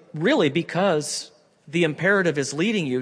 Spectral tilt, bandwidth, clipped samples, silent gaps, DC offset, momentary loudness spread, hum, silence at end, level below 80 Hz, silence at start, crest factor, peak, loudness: -4.5 dB/octave; 11 kHz; under 0.1%; none; under 0.1%; 9 LU; none; 0 s; -70 dBFS; 0.15 s; 16 dB; -8 dBFS; -22 LUFS